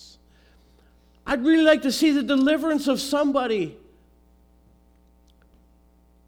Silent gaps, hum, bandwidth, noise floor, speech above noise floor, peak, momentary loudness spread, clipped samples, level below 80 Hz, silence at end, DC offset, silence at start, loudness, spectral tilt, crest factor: none; none; 18 kHz; -57 dBFS; 37 dB; -4 dBFS; 10 LU; under 0.1%; -56 dBFS; 2.55 s; under 0.1%; 1.25 s; -21 LUFS; -4 dB/octave; 20 dB